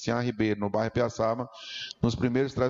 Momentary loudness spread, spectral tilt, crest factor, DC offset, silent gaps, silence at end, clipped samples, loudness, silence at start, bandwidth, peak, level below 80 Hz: 9 LU; -6.5 dB/octave; 14 dB; under 0.1%; none; 0 s; under 0.1%; -29 LUFS; 0 s; 7.8 kHz; -14 dBFS; -52 dBFS